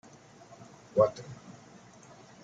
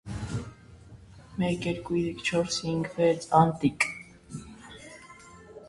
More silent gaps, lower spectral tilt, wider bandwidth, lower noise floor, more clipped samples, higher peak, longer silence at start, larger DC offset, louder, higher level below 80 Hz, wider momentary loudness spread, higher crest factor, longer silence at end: neither; about the same, -6.5 dB/octave vs -5.5 dB/octave; second, 7.8 kHz vs 11.5 kHz; first, -54 dBFS vs -50 dBFS; neither; second, -10 dBFS vs -6 dBFS; first, 0.95 s vs 0.05 s; neither; about the same, -29 LUFS vs -27 LUFS; second, -70 dBFS vs -52 dBFS; first, 26 LU vs 23 LU; about the same, 24 dB vs 24 dB; first, 0.95 s vs 0 s